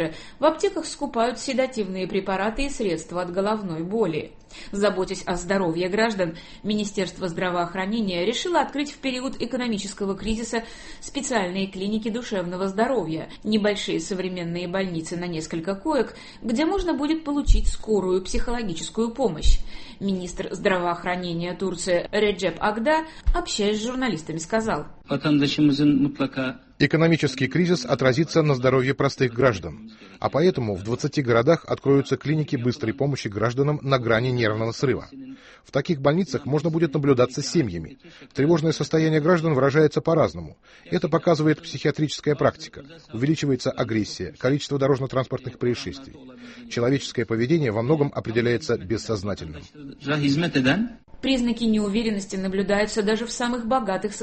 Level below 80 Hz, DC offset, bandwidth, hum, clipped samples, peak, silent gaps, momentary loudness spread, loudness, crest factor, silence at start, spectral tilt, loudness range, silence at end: -36 dBFS; under 0.1%; 8.8 kHz; none; under 0.1%; -4 dBFS; none; 10 LU; -24 LUFS; 18 dB; 0 s; -5.5 dB/octave; 5 LU; 0 s